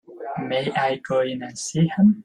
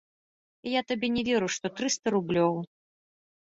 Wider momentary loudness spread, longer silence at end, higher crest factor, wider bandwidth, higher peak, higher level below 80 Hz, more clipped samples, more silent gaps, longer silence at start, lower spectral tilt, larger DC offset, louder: first, 12 LU vs 8 LU; second, 0.05 s vs 0.95 s; about the same, 14 dB vs 18 dB; first, 10.5 kHz vs 8 kHz; first, -8 dBFS vs -12 dBFS; about the same, -62 dBFS vs -64 dBFS; neither; second, none vs 1.99-2.03 s; second, 0.1 s vs 0.65 s; first, -6 dB/octave vs -4 dB/octave; neither; first, -23 LUFS vs -28 LUFS